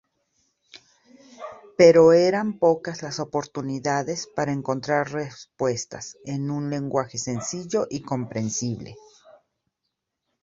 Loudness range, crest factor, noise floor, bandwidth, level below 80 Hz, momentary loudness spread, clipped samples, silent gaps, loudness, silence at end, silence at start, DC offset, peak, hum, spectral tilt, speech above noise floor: 8 LU; 22 dB; -81 dBFS; 7.8 kHz; -62 dBFS; 19 LU; under 0.1%; none; -23 LUFS; 1.45 s; 0.75 s; under 0.1%; -2 dBFS; none; -5 dB/octave; 58 dB